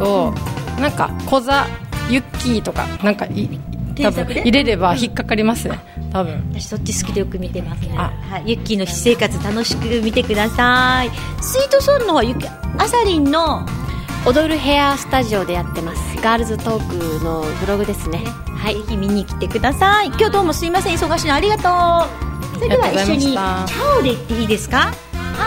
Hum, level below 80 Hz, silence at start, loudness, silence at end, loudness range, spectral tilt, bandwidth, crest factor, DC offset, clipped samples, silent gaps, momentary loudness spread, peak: none; -30 dBFS; 0 s; -17 LUFS; 0 s; 5 LU; -5 dB/octave; 16.5 kHz; 16 dB; under 0.1%; under 0.1%; none; 10 LU; -2 dBFS